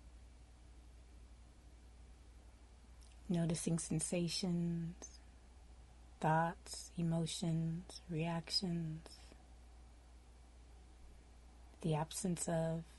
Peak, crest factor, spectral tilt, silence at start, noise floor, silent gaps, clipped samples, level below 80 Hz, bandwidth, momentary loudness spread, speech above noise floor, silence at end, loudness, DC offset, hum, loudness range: -24 dBFS; 18 dB; -5 dB/octave; 0 s; -60 dBFS; none; under 0.1%; -60 dBFS; 11.5 kHz; 25 LU; 21 dB; 0 s; -40 LUFS; under 0.1%; none; 9 LU